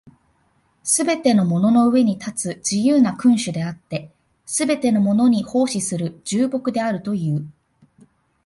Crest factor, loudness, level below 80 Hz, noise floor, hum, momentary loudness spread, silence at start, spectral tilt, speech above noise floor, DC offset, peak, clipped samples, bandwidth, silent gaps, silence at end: 16 dB; -19 LUFS; -60 dBFS; -63 dBFS; none; 11 LU; 0.05 s; -5 dB/octave; 44 dB; under 0.1%; -4 dBFS; under 0.1%; 11.5 kHz; none; 0.95 s